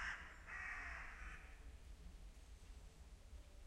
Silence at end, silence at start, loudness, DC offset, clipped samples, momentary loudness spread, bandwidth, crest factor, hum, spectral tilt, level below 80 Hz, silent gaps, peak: 0 s; 0 s; -54 LUFS; under 0.1%; under 0.1%; 14 LU; 15 kHz; 18 dB; none; -3.5 dB/octave; -58 dBFS; none; -36 dBFS